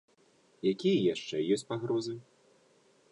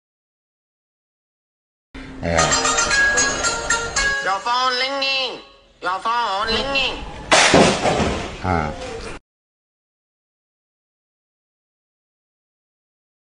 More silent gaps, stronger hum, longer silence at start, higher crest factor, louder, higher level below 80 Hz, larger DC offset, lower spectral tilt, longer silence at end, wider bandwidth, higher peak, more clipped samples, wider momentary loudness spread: neither; neither; second, 0.65 s vs 1.95 s; second, 16 dB vs 22 dB; second, -32 LUFS vs -18 LUFS; second, -76 dBFS vs -40 dBFS; neither; first, -6 dB/octave vs -2.5 dB/octave; second, 0.9 s vs 4.2 s; about the same, 10.5 kHz vs 11 kHz; second, -16 dBFS vs 0 dBFS; neither; second, 8 LU vs 15 LU